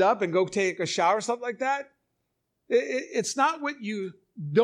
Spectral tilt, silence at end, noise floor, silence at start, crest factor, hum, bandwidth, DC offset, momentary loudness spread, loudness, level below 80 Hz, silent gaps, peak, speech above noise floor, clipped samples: -4 dB/octave; 0 s; -79 dBFS; 0 s; 18 dB; none; 13 kHz; under 0.1%; 10 LU; -27 LUFS; -76 dBFS; none; -8 dBFS; 53 dB; under 0.1%